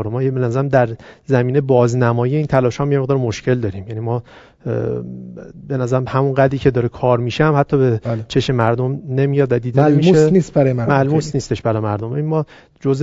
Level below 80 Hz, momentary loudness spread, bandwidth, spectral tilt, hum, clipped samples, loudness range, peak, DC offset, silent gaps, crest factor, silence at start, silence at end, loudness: -44 dBFS; 10 LU; 7.8 kHz; -7.5 dB/octave; none; under 0.1%; 5 LU; 0 dBFS; under 0.1%; none; 16 dB; 0 s; 0 s; -17 LUFS